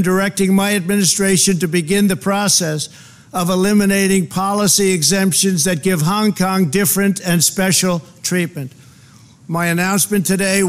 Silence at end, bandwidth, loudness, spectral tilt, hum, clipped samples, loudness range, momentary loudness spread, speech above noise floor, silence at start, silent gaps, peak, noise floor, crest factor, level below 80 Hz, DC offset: 0 s; 16 kHz; -15 LUFS; -4 dB/octave; none; under 0.1%; 3 LU; 8 LU; 29 dB; 0 s; none; -2 dBFS; -44 dBFS; 14 dB; -50 dBFS; 0.3%